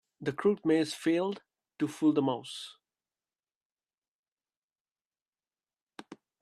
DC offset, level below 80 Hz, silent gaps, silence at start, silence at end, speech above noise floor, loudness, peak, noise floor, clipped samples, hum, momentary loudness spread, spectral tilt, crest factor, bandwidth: under 0.1%; -78 dBFS; 3.56-3.77 s, 3.94-4.02 s, 4.08-4.37 s, 4.57-4.85 s, 5.05-5.10 s, 5.28-5.33 s, 5.81-5.86 s; 0.2 s; 0.25 s; over 60 dB; -30 LUFS; -14 dBFS; under -90 dBFS; under 0.1%; none; 18 LU; -5.5 dB/octave; 20 dB; 13 kHz